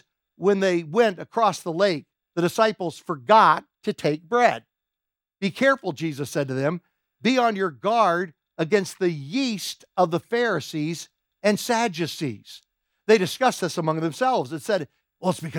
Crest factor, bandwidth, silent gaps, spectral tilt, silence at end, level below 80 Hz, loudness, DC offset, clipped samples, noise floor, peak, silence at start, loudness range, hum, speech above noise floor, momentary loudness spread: 20 dB; 18.5 kHz; none; -5 dB/octave; 0 s; -74 dBFS; -23 LUFS; under 0.1%; under 0.1%; -88 dBFS; -4 dBFS; 0.4 s; 4 LU; none; 65 dB; 11 LU